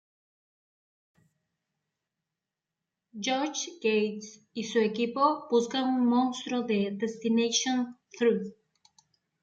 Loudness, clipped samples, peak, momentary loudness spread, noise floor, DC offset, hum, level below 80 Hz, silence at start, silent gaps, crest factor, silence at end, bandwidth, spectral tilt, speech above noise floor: -28 LUFS; under 0.1%; -12 dBFS; 11 LU; -89 dBFS; under 0.1%; none; -78 dBFS; 3.15 s; none; 18 dB; 0.9 s; 7.8 kHz; -4 dB/octave; 61 dB